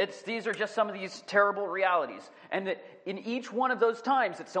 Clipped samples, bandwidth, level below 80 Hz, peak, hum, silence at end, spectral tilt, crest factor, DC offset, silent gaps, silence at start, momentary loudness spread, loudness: under 0.1%; 10 kHz; -88 dBFS; -10 dBFS; none; 0 s; -4.5 dB/octave; 20 dB; under 0.1%; none; 0 s; 12 LU; -30 LUFS